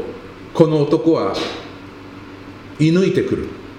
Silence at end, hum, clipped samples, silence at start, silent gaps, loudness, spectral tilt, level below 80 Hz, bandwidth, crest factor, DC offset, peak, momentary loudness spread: 0 s; none; under 0.1%; 0 s; none; -17 LUFS; -7 dB/octave; -48 dBFS; 10.5 kHz; 18 dB; under 0.1%; 0 dBFS; 21 LU